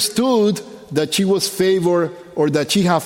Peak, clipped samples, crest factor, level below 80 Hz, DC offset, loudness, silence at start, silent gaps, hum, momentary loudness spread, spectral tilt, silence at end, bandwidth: -2 dBFS; under 0.1%; 16 dB; -58 dBFS; under 0.1%; -18 LUFS; 0 s; none; none; 7 LU; -4.5 dB/octave; 0 s; 17 kHz